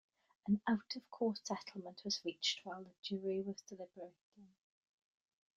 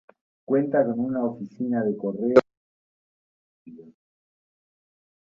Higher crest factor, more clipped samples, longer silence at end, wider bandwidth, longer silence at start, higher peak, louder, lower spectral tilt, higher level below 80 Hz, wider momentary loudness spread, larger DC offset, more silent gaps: second, 20 dB vs 26 dB; neither; second, 1.1 s vs 1.6 s; about the same, 7.6 kHz vs 7.4 kHz; about the same, 0.45 s vs 0.5 s; second, -24 dBFS vs -2 dBFS; second, -41 LUFS vs -24 LUFS; second, -4 dB/octave vs -8.5 dB/octave; second, -82 dBFS vs -68 dBFS; first, 15 LU vs 8 LU; neither; second, 2.99-3.03 s, 4.21-4.32 s vs 2.57-3.65 s